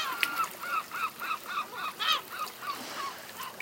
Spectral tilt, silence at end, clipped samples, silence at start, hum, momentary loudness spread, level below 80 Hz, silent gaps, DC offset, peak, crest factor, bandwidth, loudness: 0 dB/octave; 0 s; under 0.1%; 0 s; none; 9 LU; -82 dBFS; none; under 0.1%; -6 dBFS; 28 dB; 17 kHz; -33 LUFS